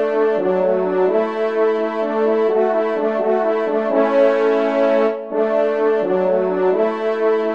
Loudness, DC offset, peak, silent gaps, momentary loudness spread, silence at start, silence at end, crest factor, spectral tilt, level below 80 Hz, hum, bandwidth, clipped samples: -17 LUFS; 0.3%; -2 dBFS; none; 4 LU; 0 s; 0 s; 14 dB; -7.5 dB/octave; -70 dBFS; none; 6.8 kHz; under 0.1%